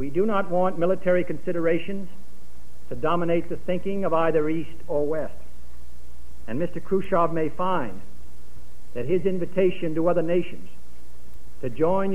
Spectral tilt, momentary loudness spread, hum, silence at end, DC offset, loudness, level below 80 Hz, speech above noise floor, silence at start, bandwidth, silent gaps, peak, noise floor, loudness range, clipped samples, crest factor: -8 dB/octave; 13 LU; none; 0 s; 7%; -25 LUFS; -50 dBFS; 25 dB; 0 s; 14 kHz; none; -8 dBFS; -50 dBFS; 3 LU; under 0.1%; 18 dB